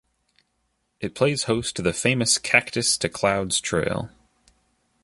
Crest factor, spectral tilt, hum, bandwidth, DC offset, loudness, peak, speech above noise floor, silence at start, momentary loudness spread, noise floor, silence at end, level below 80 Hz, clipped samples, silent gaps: 22 dB; -3 dB/octave; none; 12 kHz; under 0.1%; -22 LUFS; -2 dBFS; 49 dB; 1 s; 12 LU; -73 dBFS; 0.95 s; -52 dBFS; under 0.1%; none